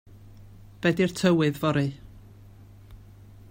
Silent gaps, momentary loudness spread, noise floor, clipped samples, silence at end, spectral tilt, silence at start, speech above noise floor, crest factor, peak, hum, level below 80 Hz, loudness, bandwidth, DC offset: none; 8 LU; -49 dBFS; under 0.1%; 0.55 s; -6.5 dB/octave; 0.15 s; 25 dB; 20 dB; -8 dBFS; none; -54 dBFS; -25 LUFS; 16 kHz; under 0.1%